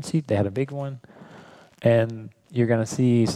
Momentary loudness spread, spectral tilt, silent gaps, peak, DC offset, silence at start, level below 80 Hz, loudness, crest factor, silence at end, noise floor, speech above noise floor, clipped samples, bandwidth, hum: 13 LU; -7 dB/octave; none; -8 dBFS; under 0.1%; 0 s; -60 dBFS; -24 LUFS; 16 dB; 0 s; -48 dBFS; 26 dB; under 0.1%; 12.5 kHz; none